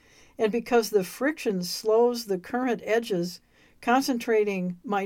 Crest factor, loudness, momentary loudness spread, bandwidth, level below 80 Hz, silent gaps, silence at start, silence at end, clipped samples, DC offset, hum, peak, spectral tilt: 16 dB; -26 LUFS; 8 LU; 17 kHz; -64 dBFS; none; 0.4 s; 0 s; under 0.1%; under 0.1%; none; -10 dBFS; -5 dB/octave